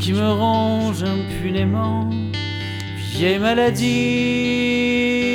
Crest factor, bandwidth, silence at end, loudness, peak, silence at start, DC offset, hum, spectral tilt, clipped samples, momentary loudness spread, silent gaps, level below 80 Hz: 14 dB; 16.5 kHz; 0 s; -19 LUFS; -4 dBFS; 0 s; under 0.1%; none; -6 dB/octave; under 0.1%; 8 LU; none; -44 dBFS